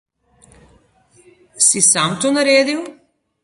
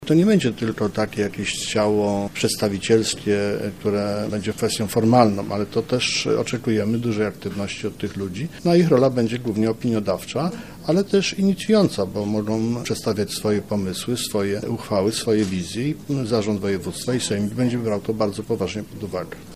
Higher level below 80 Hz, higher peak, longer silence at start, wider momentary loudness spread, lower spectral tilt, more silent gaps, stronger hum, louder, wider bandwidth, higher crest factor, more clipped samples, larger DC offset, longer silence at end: second, -60 dBFS vs -52 dBFS; about the same, 0 dBFS vs 0 dBFS; first, 1.55 s vs 0 s; first, 12 LU vs 8 LU; second, -2 dB/octave vs -5.5 dB/octave; neither; neither; first, -14 LUFS vs -22 LUFS; second, 11.5 kHz vs 15.5 kHz; about the same, 18 dB vs 22 dB; neither; second, under 0.1% vs 0.3%; first, 0.5 s vs 0 s